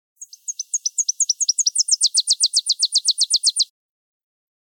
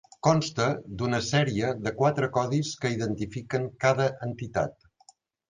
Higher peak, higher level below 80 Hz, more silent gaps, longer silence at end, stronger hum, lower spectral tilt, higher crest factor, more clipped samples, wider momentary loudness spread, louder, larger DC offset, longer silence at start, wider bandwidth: about the same, -6 dBFS vs -8 dBFS; second, under -90 dBFS vs -56 dBFS; neither; first, 1 s vs 0.8 s; neither; second, 14.5 dB/octave vs -5.5 dB/octave; about the same, 16 dB vs 20 dB; neither; about the same, 8 LU vs 7 LU; first, -17 LUFS vs -27 LUFS; neither; about the same, 0.2 s vs 0.25 s; first, 18 kHz vs 9.8 kHz